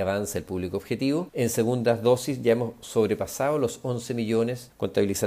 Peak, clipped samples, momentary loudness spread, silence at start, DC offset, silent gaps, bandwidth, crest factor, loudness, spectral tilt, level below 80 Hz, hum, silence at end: -8 dBFS; under 0.1%; 7 LU; 0 s; under 0.1%; none; 16 kHz; 16 dB; -26 LUFS; -5.5 dB/octave; -60 dBFS; none; 0 s